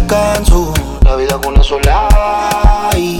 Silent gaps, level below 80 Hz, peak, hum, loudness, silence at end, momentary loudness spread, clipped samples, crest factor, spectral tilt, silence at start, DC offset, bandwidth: none; -12 dBFS; 0 dBFS; none; -12 LUFS; 0 s; 2 LU; under 0.1%; 10 dB; -5 dB/octave; 0 s; under 0.1%; 17 kHz